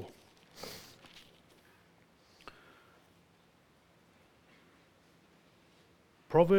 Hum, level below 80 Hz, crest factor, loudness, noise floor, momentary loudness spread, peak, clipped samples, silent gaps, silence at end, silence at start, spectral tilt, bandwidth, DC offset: none; -68 dBFS; 26 dB; -36 LUFS; -66 dBFS; 17 LU; -12 dBFS; under 0.1%; none; 0 s; 0 s; -7 dB/octave; 19 kHz; under 0.1%